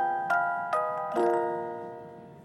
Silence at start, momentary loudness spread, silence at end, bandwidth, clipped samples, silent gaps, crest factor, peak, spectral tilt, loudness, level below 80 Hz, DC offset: 0 s; 15 LU; 0 s; 12.5 kHz; under 0.1%; none; 16 dB; -14 dBFS; -6 dB/octave; -29 LUFS; -76 dBFS; under 0.1%